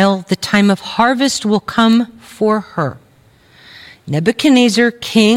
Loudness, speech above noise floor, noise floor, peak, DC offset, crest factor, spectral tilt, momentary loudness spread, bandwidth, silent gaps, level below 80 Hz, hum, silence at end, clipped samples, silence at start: -14 LUFS; 35 dB; -49 dBFS; 0 dBFS; under 0.1%; 14 dB; -5 dB/octave; 10 LU; 16 kHz; none; -52 dBFS; none; 0 s; under 0.1%; 0 s